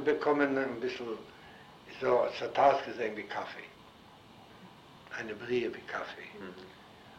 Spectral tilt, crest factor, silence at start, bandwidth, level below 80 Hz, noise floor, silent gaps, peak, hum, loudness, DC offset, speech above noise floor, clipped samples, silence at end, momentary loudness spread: -5.5 dB/octave; 22 dB; 0 s; 15 kHz; -70 dBFS; -56 dBFS; none; -12 dBFS; none; -32 LUFS; under 0.1%; 23 dB; under 0.1%; 0 s; 25 LU